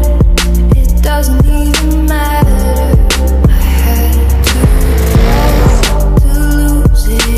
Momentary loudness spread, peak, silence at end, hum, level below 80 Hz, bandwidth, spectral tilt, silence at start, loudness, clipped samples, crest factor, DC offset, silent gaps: 2 LU; 0 dBFS; 0 s; none; -8 dBFS; 15.5 kHz; -5.5 dB/octave; 0 s; -10 LUFS; under 0.1%; 8 dB; under 0.1%; none